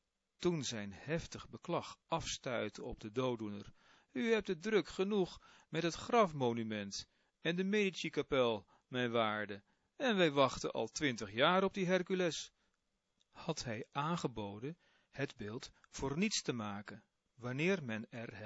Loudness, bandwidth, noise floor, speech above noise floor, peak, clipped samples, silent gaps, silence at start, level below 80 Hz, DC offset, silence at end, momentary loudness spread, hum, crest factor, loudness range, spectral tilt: -38 LUFS; 7.6 kHz; -84 dBFS; 46 dB; -16 dBFS; under 0.1%; none; 0.4 s; -66 dBFS; under 0.1%; 0 s; 15 LU; none; 22 dB; 7 LU; -4 dB/octave